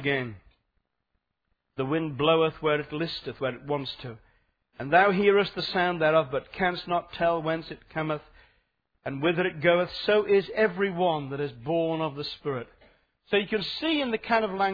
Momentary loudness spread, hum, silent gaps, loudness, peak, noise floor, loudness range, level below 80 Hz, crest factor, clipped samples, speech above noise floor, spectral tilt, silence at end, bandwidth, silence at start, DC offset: 12 LU; none; none; -27 LUFS; -6 dBFS; -79 dBFS; 4 LU; -58 dBFS; 22 dB; under 0.1%; 52 dB; -7.5 dB/octave; 0 s; 5 kHz; 0 s; under 0.1%